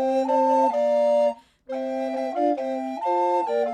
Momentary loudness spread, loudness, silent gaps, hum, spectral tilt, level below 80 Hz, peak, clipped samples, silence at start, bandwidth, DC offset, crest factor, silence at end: 9 LU; -23 LUFS; none; none; -4.5 dB/octave; -70 dBFS; -10 dBFS; under 0.1%; 0 s; 9.8 kHz; under 0.1%; 12 dB; 0 s